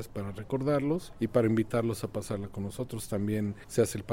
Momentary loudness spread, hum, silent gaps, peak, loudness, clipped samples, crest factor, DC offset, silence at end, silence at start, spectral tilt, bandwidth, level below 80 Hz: 10 LU; none; none; -12 dBFS; -31 LUFS; under 0.1%; 18 dB; under 0.1%; 0 s; 0 s; -6.5 dB/octave; 16.5 kHz; -54 dBFS